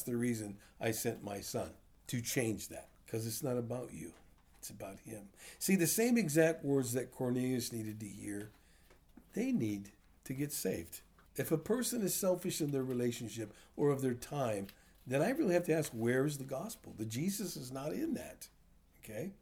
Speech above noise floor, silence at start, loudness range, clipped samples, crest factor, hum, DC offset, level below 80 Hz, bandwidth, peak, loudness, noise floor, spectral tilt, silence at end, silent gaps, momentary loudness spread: 28 dB; 0 s; 7 LU; under 0.1%; 20 dB; none; under 0.1%; -68 dBFS; over 20 kHz; -16 dBFS; -37 LUFS; -64 dBFS; -5 dB/octave; 0.1 s; none; 18 LU